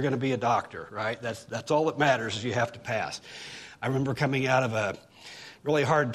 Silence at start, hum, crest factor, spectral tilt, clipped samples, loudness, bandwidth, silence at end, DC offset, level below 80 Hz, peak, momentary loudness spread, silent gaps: 0 s; none; 18 dB; -5.5 dB/octave; under 0.1%; -28 LUFS; 13.5 kHz; 0 s; under 0.1%; -64 dBFS; -10 dBFS; 16 LU; none